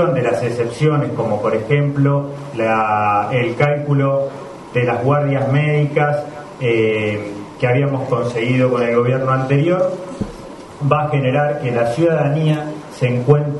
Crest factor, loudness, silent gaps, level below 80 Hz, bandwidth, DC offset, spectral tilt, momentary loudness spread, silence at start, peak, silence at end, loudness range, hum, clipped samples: 16 dB; -17 LUFS; none; -50 dBFS; 11 kHz; under 0.1%; -8 dB/octave; 8 LU; 0 s; 0 dBFS; 0 s; 1 LU; none; under 0.1%